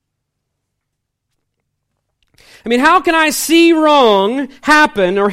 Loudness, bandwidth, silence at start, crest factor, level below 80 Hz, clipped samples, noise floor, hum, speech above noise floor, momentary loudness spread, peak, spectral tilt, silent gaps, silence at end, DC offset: -11 LUFS; 16.5 kHz; 2.65 s; 14 dB; -50 dBFS; under 0.1%; -74 dBFS; none; 63 dB; 9 LU; 0 dBFS; -3 dB/octave; none; 0 s; under 0.1%